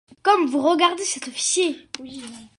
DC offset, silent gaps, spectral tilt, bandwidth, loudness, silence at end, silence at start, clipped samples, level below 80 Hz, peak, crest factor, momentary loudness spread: under 0.1%; none; -1 dB/octave; 11.5 kHz; -20 LUFS; 0.1 s; 0.25 s; under 0.1%; -68 dBFS; -2 dBFS; 20 dB; 17 LU